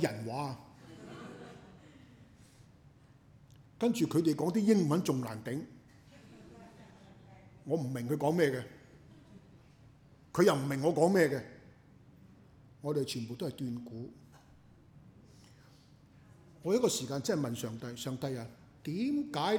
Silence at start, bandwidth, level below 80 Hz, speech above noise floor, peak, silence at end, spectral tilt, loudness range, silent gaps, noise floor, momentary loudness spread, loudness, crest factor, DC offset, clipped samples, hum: 0 s; over 20 kHz; -70 dBFS; 28 dB; -14 dBFS; 0 s; -5.5 dB/octave; 10 LU; none; -60 dBFS; 23 LU; -33 LUFS; 22 dB; under 0.1%; under 0.1%; none